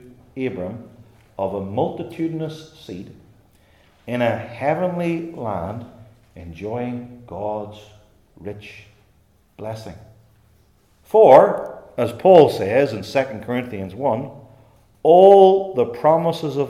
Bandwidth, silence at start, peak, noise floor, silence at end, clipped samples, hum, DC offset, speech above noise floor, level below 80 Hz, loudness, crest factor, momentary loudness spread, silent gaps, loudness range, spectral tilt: 14 kHz; 0.35 s; 0 dBFS; -58 dBFS; 0 s; under 0.1%; none; under 0.1%; 40 dB; -58 dBFS; -18 LUFS; 20 dB; 24 LU; none; 16 LU; -7.5 dB/octave